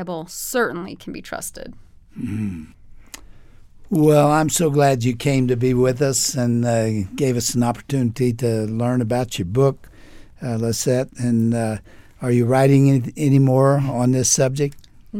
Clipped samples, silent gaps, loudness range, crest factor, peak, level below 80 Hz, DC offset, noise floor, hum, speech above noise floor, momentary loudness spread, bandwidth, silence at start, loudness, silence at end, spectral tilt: under 0.1%; none; 6 LU; 16 dB; -2 dBFS; -46 dBFS; under 0.1%; -43 dBFS; none; 24 dB; 14 LU; 16.5 kHz; 0 s; -19 LUFS; 0 s; -5.5 dB/octave